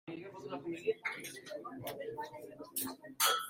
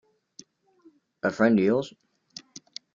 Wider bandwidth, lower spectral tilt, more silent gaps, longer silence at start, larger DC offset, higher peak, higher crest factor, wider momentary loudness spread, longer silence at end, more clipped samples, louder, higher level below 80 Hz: first, 16.5 kHz vs 7.6 kHz; second, -1.5 dB/octave vs -6 dB/octave; neither; second, 0.05 s vs 1.25 s; neither; second, -16 dBFS vs -8 dBFS; about the same, 24 dB vs 20 dB; second, 12 LU vs 23 LU; second, 0 s vs 1.05 s; neither; second, -40 LUFS vs -24 LUFS; second, -80 dBFS vs -70 dBFS